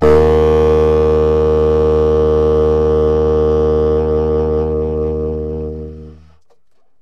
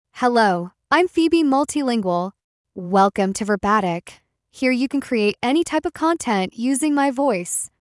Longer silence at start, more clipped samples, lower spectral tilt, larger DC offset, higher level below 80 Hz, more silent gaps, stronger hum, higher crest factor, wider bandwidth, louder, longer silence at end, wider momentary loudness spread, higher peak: second, 0 s vs 0.15 s; neither; first, -9 dB/octave vs -4.5 dB/octave; neither; first, -24 dBFS vs -56 dBFS; second, none vs 2.44-2.64 s; neither; about the same, 12 dB vs 16 dB; second, 6.6 kHz vs 12 kHz; first, -13 LUFS vs -20 LUFS; first, 0.9 s vs 0.35 s; about the same, 9 LU vs 8 LU; about the same, -2 dBFS vs -4 dBFS